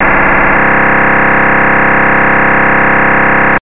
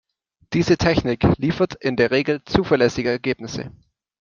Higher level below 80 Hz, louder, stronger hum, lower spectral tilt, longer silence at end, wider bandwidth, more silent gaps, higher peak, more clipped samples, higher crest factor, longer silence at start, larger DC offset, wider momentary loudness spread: first, -26 dBFS vs -42 dBFS; first, -7 LUFS vs -20 LUFS; neither; first, -9 dB/octave vs -6.5 dB/octave; second, 0.05 s vs 0.5 s; second, 4 kHz vs 7.4 kHz; neither; about the same, 0 dBFS vs -2 dBFS; neither; second, 6 dB vs 18 dB; second, 0 s vs 0.5 s; first, 10% vs under 0.1%; second, 0 LU vs 9 LU